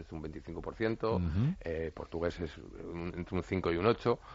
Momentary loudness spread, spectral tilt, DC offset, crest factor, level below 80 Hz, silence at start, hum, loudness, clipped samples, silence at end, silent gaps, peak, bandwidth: 13 LU; -6.5 dB/octave; under 0.1%; 20 dB; -52 dBFS; 0 s; none; -35 LUFS; under 0.1%; 0 s; none; -14 dBFS; 7.6 kHz